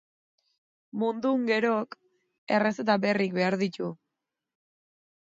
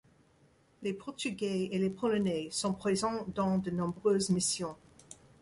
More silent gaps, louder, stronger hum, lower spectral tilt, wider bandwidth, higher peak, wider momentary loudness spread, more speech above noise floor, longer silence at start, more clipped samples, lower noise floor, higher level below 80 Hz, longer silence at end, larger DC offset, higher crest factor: first, 2.38-2.47 s vs none; first, -27 LUFS vs -33 LUFS; neither; first, -6.5 dB/octave vs -5 dB/octave; second, 7.8 kHz vs 11.5 kHz; first, -10 dBFS vs -18 dBFS; about the same, 11 LU vs 10 LU; first, 59 dB vs 34 dB; first, 0.95 s vs 0.8 s; neither; first, -86 dBFS vs -66 dBFS; second, -76 dBFS vs -64 dBFS; first, 1.35 s vs 0.25 s; neither; about the same, 20 dB vs 16 dB